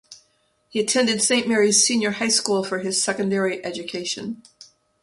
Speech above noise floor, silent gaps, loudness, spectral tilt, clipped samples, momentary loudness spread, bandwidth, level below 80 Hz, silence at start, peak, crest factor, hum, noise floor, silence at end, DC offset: 43 dB; none; -20 LUFS; -2 dB/octave; under 0.1%; 13 LU; 11.5 kHz; -68 dBFS; 0.1 s; -4 dBFS; 20 dB; none; -65 dBFS; 0.4 s; under 0.1%